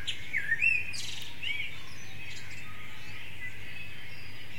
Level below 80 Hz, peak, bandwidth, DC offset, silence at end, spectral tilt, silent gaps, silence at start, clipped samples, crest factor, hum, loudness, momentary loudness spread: -60 dBFS; -14 dBFS; 16.5 kHz; 3%; 0 s; -1.5 dB/octave; none; 0 s; under 0.1%; 20 dB; none; -33 LUFS; 18 LU